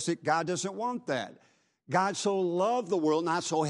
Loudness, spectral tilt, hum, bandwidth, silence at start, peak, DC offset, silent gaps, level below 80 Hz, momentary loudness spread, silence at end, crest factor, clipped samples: -30 LUFS; -4.5 dB/octave; none; 11.5 kHz; 0 s; -12 dBFS; under 0.1%; none; -80 dBFS; 7 LU; 0 s; 18 dB; under 0.1%